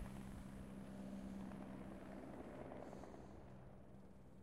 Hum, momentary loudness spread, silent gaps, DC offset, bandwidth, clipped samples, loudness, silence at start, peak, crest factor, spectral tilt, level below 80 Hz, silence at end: none; 9 LU; none; under 0.1%; 15.5 kHz; under 0.1%; -55 LUFS; 0 s; -38 dBFS; 16 dB; -7 dB/octave; -64 dBFS; 0 s